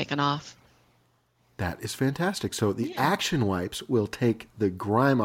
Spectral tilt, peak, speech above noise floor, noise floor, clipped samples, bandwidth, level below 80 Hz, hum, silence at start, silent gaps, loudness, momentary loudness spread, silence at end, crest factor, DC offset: -5.5 dB/octave; -10 dBFS; 41 dB; -67 dBFS; under 0.1%; 17 kHz; -56 dBFS; none; 0 s; none; -27 LUFS; 8 LU; 0 s; 18 dB; under 0.1%